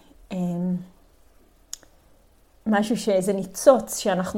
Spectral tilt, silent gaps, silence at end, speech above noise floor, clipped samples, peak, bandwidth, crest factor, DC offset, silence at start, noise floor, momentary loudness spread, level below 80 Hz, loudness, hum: -5 dB/octave; none; 0 s; 35 dB; under 0.1%; -2 dBFS; 16.5 kHz; 22 dB; under 0.1%; 0.3 s; -57 dBFS; 21 LU; -56 dBFS; -23 LUFS; none